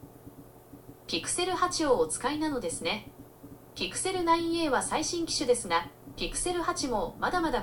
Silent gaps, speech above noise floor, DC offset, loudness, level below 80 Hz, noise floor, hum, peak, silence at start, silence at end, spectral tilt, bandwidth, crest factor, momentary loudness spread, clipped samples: none; 21 dB; under 0.1%; -29 LUFS; -50 dBFS; -51 dBFS; none; -12 dBFS; 0 s; 0 s; -3 dB/octave; 18 kHz; 18 dB; 10 LU; under 0.1%